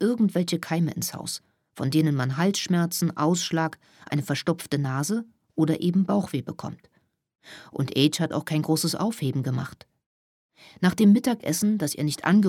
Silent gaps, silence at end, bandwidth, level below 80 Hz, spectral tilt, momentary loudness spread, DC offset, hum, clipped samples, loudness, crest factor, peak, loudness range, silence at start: 10.06-10.49 s; 0 s; 17 kHz; -66 dBFS; -5.5 dB/octave; 10 LU; under 0.1%; none; under 0.1%; -25 LUFS; 18 dB; -6 dBFS; 2 LU; 0 s